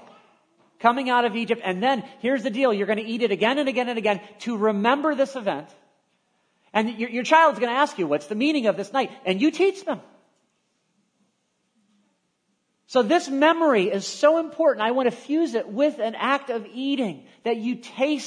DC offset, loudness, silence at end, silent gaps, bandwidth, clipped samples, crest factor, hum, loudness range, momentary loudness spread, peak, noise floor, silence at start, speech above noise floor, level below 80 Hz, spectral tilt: under 0.1%; -23 LUFS; 0 s; none; 10.5 kHz; under 0.1%; 22 dB; none; 6 LU; 8 LU; -2 dBFS; -72 dBFS; 0.8 s; 50 dB; -80 dBFS; -4.5 dB/octave